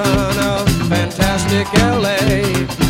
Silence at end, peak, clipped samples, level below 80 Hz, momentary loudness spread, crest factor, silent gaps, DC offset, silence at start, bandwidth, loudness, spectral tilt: 0 s; 0 dBFS; under 0.1%; -28 dBFS; 3 LU; 14 dB; none; under 0.1%; 0 s; 17 kHz; -15 LUFS; -5 dB/octave